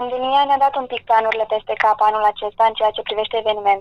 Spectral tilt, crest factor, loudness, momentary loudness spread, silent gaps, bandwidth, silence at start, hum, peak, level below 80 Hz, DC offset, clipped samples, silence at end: -4 dB/octave; 16 dB; -18 LUFS; 6 LU; none; 6.4 kHz; 0 s; none; -2 dBFS; -54 dBFS; under 0.1%; under 0.1%; 0 s